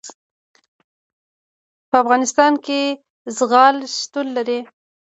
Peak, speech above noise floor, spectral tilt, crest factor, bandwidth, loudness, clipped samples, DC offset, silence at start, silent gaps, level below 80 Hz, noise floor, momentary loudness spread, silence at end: 0 dBFS; over 73 dB; -2 dB/octave; 20 dB; 8.2 kHz; -17 LUFS; under 0.1%; under 0.1%; 0.05 s; 0.14-0.54 s, 0.68-1.92 s, 3.10-3.25 s; -68 dBFS; under -90 dBFS; 11 LU; 0.4 s